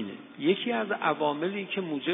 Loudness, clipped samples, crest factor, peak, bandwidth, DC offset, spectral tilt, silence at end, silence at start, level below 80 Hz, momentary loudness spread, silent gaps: -29 LUFS; under 0.1%; 18 dB; -12 dBFS; 3.9 kHz; under 0.1%; -2 dB/octave; 0 s; 0 s; -84 dBFS; 5 LU; none